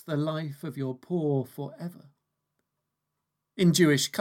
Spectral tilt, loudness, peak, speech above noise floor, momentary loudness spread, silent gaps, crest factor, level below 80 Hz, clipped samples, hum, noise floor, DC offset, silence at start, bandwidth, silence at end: -5 dB/octave; -27 LUFS; -8 dBFS; 56 dB; 18 LU; none; 20 dB; -78 dBFS; under 0.1%; none; -83 dBFS; under 0.1%; 0.05 s; 17 kHz; 0 s